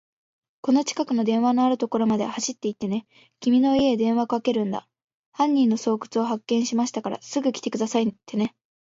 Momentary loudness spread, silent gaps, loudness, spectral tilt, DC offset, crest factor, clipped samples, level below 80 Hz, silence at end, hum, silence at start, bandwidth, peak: 9 LU; 5.04-5.08 s, 5.14-5.32 s; -24 LUFS; -5 dB/octave; under 0.1%; 14 dB; under 0.1%; -64 dBFS; 0.5 s; none; 0.65 s; 7.8 kHz; -8 dBFS